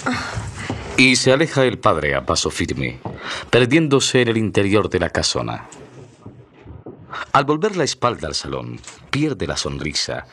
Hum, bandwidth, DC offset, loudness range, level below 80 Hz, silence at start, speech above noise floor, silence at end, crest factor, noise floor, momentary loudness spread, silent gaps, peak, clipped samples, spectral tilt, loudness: none; 12.5 kHz; under 0.1%; 5 LU; -44 dBFS; 0 s; 24 dB; 0.05 s; 18 dB; -42 dBFS; 16 LU; none; 0 dBFS; under 0.1%; -4 dB/octave; -19 LUFS